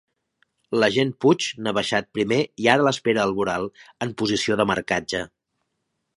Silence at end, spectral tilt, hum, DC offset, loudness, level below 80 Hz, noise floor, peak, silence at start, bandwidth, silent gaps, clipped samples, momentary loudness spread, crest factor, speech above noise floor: 0.9 s; -4.5 dB/octave; none; under 0.1%; -22 LUFS; -58 dBFS; -77 dBFS; 0 dBFS; 0.7 s; 11.5 kHz; none; under 0.1%; 10 LU; 22 dB; 55 dB